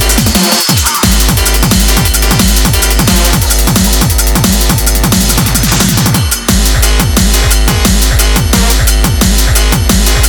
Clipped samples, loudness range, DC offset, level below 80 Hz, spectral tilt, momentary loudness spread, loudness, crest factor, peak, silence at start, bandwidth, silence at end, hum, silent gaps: 0.3%; 1 LU; under 0.1%; -12 dBFS; -3.5 dB/octave; 1 LU; -8 LUFS; 8 dB; 0 dBFS; 0 s; over 20 kHz; 0 s; none; none